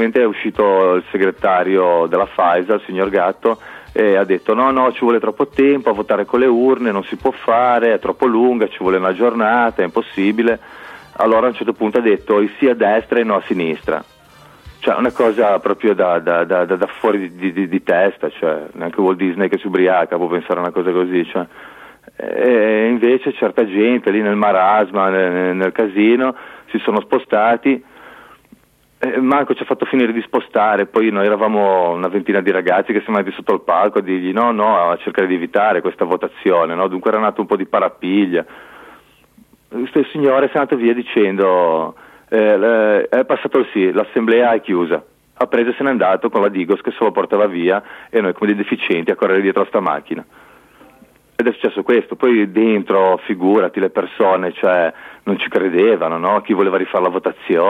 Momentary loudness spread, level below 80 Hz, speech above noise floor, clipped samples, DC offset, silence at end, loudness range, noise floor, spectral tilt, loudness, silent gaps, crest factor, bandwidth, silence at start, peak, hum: 6 LU; -56 dBFS; 35 dB; under 0.1%; under 0.1%; 0 s; 3 LU; -50 dBFS; -7.5 dB/octave; -16 LUFS; none; 14 dB; 5.2 kHz; 0 s; -2 dBFS; none